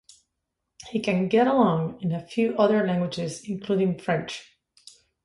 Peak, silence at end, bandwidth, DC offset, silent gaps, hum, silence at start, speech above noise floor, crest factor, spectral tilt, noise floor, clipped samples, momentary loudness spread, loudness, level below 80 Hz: -6 dBFS; 0.8 s; 11.5 kHz; under 0.1%; none; none; 0.8 s; 57 dB; 18 dB; -6.5 dB/octave; -81 dBFS; under 0.1%; 11 LU; -24 LUFS; -62 dBFS